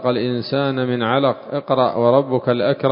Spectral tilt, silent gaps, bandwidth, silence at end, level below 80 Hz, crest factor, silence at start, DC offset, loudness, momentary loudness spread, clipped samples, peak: -11.5 dB/octave; none; 5.4 kHz; 0 s; -60 dBFS; 18 dB; 0 s; under 0.1%; -18 LUFS; 5 LU; under 0.1%; 0 dBFS